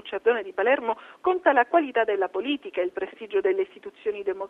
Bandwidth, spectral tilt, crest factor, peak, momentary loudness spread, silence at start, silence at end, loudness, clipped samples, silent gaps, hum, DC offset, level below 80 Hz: 4 kHz; -5.5 dB/octave; 18 dB; -6 dBFS; 10 LU; 0.05 s; 0 s; -25 LUFS; under 0.1%; none; none; under 0.1%; -68 dBFS